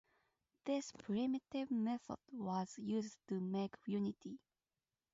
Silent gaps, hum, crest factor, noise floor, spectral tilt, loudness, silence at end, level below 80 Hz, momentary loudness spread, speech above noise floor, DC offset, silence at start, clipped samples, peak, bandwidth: none; none; 16 dB; under -90 dBFS; -6.5 dB/octave; -43 LUFS; 0.75 s; -80 dBFS; 10 LU; over 48 dB; under 0.1%; 0.65 s; under 0.1%; -28 dBFS; 7.6 kHz